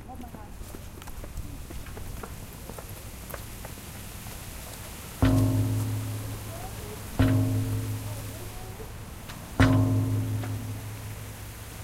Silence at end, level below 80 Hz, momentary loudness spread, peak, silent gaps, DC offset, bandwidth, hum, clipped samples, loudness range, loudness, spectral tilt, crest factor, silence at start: 0 s; -40 dBFS; 17 LU; -8 dBFS; none; under 0.1%; 16 kHz; none; under 0.1%; 12 LU; -31 LUFS; -6 dB/octave; 22 dB; 0 s